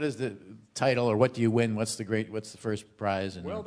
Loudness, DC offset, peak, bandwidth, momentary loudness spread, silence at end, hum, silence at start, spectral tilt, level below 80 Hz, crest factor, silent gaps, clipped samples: -29 LUFS; under 0.1%; -10 dBFS; 11 kHz; 11 LU; 0 s; none; 0 s; -5.5 dB/octave; -68 dBFS; 20 dB; none; under 0.1%